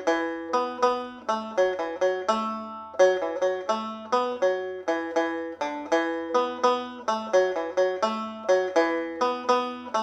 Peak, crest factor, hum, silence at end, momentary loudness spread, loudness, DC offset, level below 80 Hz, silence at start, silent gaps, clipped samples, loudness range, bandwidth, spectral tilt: -8 dBFS; 18 dB; none; 0 s; 7 LU; -26 LUFS; under 0.1%; -70 dBFS; 0 s; none; under 0.1%; 2 LU; 8.8 kHz; -3.5 dB/octave